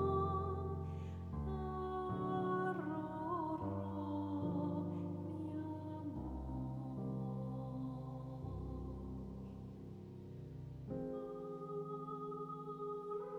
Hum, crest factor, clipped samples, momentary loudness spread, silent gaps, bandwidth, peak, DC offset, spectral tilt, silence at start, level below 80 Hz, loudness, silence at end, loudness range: none; 18 dB; under 0.1%; 11 LU; none; 10 kHz; -26 dBFS; under 0.1%; -9.5 dB/octave; 0 s; -58 dBFS; -44 LUFS; 0 s; 7 LU